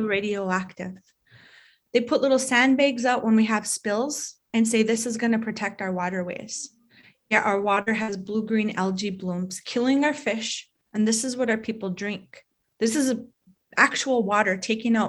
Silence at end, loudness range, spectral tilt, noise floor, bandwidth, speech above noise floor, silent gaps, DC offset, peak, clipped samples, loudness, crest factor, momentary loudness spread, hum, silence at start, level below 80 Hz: 0 s; 4 LU; -4 dB/octave; -57 dBFS; 12.5 kHz; 33 dB; none; under 0.1%; -4 dBFS; under 0.1%; -24 LUFS; 22 dB; 11 LU; none; 0 s; -68 dBFS